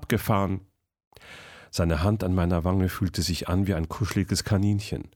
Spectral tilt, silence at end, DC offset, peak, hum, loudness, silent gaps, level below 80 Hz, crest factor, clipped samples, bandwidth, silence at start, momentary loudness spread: -6 dB/octave; 0.1 s; under 0.1%; -10 dBFS; none; -26 LUFS; 1.07-1.11 s; -40 dBFS; 16 dB; under 0.1%; 19.5 kHz; 0 s; 11 LU